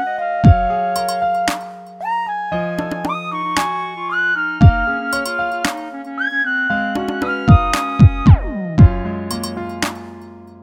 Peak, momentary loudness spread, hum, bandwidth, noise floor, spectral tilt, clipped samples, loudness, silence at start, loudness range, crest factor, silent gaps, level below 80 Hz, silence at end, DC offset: 0 dBFS; 11 LU; none; 17.5 kHz; -37 dBFS; -6.5 dB/octave; under 0.1%; -17 LUFS; 0 s; 6 LU; 16 dB; none; -26 dBFS; 0 s; under 0.1%